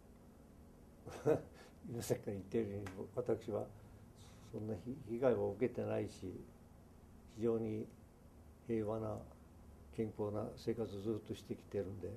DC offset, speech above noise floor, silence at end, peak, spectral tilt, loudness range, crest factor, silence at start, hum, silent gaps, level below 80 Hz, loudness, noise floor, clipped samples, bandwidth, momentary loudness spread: under 0.1%; 20 dB; 0 s; -20 dBFS; -7 dB/octave; 3 LU; 22 dB; 0 s; none; none; -64 dBFS; -42 LUFS; -61 dBFS; under 0.1%; 13.5 kHz; 24 LU